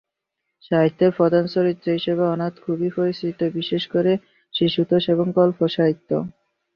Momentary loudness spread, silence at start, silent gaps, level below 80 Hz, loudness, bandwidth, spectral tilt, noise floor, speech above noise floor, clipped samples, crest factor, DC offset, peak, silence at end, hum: 8 LU; 0.7 s; none; -62 dBFS; -21 LUFS; 5.8 kHz; -9 dB/octave; -80 dBFS; 60 dB; under 0.1%; 16 dB; under 0.1%; -4 dBFS; 0.45 s; none